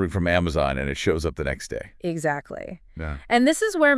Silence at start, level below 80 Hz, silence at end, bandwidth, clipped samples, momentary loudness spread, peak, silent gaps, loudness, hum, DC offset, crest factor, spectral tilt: 0 s; -40 dBFS; 0 s; 12 kHz; under 0.1%; 15 LU; -6 dBFS; none; -24 LUFS; none; under 0.1%; 18 dB; -5 dB/octave